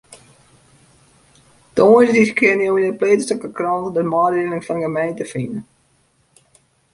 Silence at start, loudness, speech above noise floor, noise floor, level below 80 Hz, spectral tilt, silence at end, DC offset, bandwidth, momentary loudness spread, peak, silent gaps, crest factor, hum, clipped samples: 0.1 s; -17 LUFS; 44 dB; -60 dBFS; -58 dBFS; -6 dB/octave; 1.3 s; under 0.1%; 11.5 kHz; 13 LU; -2 dBFS; none; 18 dB; none; under 0.1%